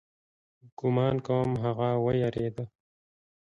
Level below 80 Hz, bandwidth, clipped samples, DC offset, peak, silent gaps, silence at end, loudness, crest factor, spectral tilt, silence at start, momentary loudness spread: -60 dBFS; 7.2 kHz; under 0.1%; under 0.1%; -14 dBFS; 0.72-0.77 s; 0.9 s; -28 LUFS; 16 dB; -9 dB/octave; 0.65 s; 8 LU